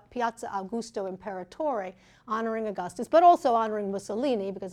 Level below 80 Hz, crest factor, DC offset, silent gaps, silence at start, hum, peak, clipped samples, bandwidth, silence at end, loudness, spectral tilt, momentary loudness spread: -66 dBFS; 18 dB; under 0.1%; none; 0.1 s; none; -10 dBFS; under 0.1%; 12 kHz; 0 s; -27 LUFS; -5.5 dB/octave; 15 LU